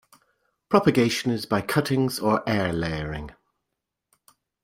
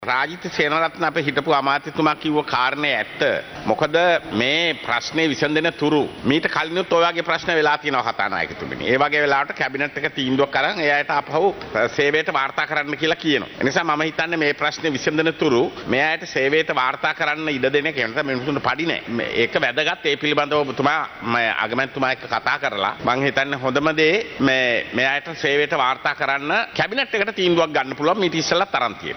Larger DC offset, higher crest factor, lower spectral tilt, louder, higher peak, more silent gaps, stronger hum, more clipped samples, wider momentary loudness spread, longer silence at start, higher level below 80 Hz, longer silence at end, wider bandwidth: neither; about the same, 22 dB vs 18 dB; about the same, -5.5 dB/octave vs -4.5 dB/octave; second, -24 LUFS vs -20 LUFS; about the same, -4 dBFS vs -4 dBFS; neither; neither; neither; first, 11 LU vs 4 LU; first, 0.7 s vs 0 s; first, -50 dBFS vs -56 dBFS; first, 1.35 s vs 0 s; second, 16 kHz vs over 20 kHz